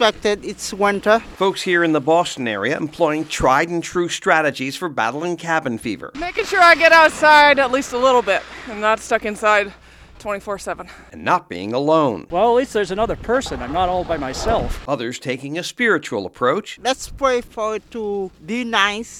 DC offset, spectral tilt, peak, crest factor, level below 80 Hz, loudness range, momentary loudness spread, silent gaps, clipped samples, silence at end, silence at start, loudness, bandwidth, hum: under 0.1%; -4 dB/octave; 0 dBFS; 18 dB; -40 dBFS; 8 LU; 14 LU; none; under 0.1%; 0 s; 0 s; -18 LUFS; 17 kHz; none